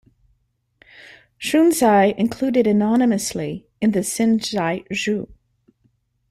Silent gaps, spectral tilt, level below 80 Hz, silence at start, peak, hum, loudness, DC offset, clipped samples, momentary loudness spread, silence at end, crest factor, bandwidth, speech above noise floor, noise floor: none; -5 dB/octave; -56 dBFS; 1.4 s; -4 dBFS; none; -19 LUFS; under 0.1%; under 0.1%; 12 LU; 1 s; 16 dB; 14.5 kHz; 49 dB; -67 dBFS